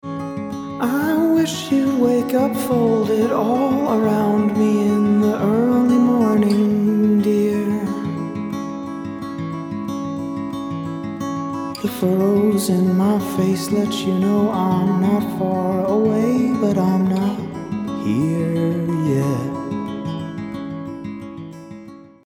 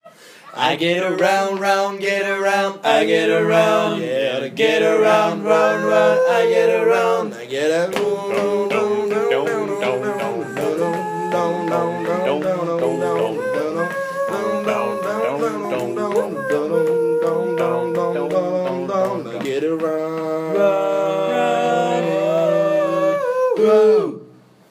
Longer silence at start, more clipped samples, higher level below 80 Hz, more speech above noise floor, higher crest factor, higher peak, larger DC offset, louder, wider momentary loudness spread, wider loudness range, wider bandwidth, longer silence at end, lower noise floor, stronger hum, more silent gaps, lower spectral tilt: about the same, 0.05 s vs 0.05 s; neither; first, -56 dBFS vs -74 dBFS; second, 23 dB vs 28 dB; about the same, 14 dB vs 16 dB; second, -6 dBFS vs -2 dBFS; neither; about the same, -19 LUFS vs -18 LUFS; first, 12 LU vs 7 LU; first, 8 LU vs 5 LU; first, 19.5 kHz vs 15.5 kHz; second, 0.2 s vs 0.45 s; second, -39 dBFS vs -45 dBFS; neither; neither; first, -7 dB/octave vs -5 dB/octave